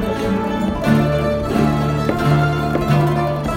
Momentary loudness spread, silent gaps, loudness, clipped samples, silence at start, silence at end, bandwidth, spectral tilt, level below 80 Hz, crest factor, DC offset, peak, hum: 4 LU; none; -17 LUFS; under 0.1%; 0 s; 0 s; 16.5 kHz; -7.5 dB/octave; -32 dBFS; 16 dB; under 0.1%; 0 dBFS; none